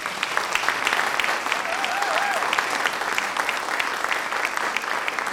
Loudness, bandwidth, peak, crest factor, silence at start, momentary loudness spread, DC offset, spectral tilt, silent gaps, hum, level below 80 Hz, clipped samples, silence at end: -23 LUFS; over 20 kHz; -6 dBFS; 20 dB; 0 s; 3 LU; under 0.1%; -0.5 dB/octave; none; none; -62 dBFS; under 0.1%; 0 s